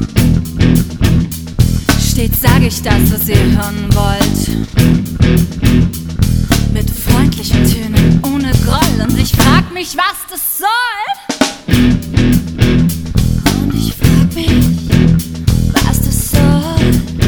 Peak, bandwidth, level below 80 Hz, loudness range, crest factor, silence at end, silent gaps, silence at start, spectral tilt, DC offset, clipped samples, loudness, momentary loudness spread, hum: 0 dBFS; over 20 kHz; -20 dBFS; 1 LU; 12 dB; 0 s; none; 0 s; -5.5 dB/octave; 0.1%; 0.3%; -12 LUFS; 5 LU; none